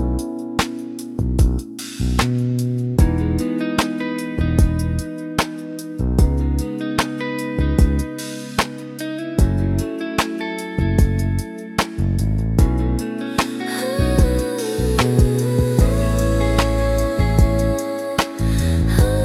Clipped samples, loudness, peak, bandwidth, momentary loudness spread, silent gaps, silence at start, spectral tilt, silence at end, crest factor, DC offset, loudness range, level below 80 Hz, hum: under 0.1%; -20 LUFS; 0 dBFS; 15.5 kHz; 8 LU; none; 0 s; -6 dB/octave; 0 s; 18 dB; under 0.1%; 3 LU; -24 dBFS; none